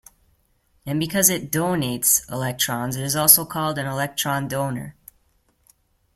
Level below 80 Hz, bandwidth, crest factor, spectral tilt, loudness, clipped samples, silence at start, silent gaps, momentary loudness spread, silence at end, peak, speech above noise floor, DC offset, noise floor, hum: -56 dBFS; 16.5 kHz; 24 dB; -3 dB/octave; -20 LUFS; under 0.1%; 0.85 s; none; 14 LU; 1.25 s; 0 dBFS; 42 dB; under 0.1%; -64 dBFS; none